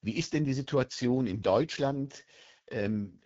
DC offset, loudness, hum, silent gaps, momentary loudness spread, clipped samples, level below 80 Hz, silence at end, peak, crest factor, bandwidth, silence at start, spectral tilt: under 0.1%; -31 LUFS; none; none; 10 LU; under 0.1%; -62 dBFS; 0.15 s; -12 dBFS; 18 dB; 8 kHz; 0.05 s; -6 dB/octave